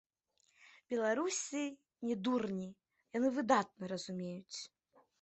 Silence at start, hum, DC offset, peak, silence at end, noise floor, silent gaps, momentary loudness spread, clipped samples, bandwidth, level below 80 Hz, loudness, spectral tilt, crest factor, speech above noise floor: 0.6 s; none; under 0.1%; -16 dBFS; 0.55 s; -78 dBFS; none; 13 LU; under 0.1%; 8.2 kHz; -82 dBFS; -38 LUFS; -4 dB/octave; 24 dB; 41 dB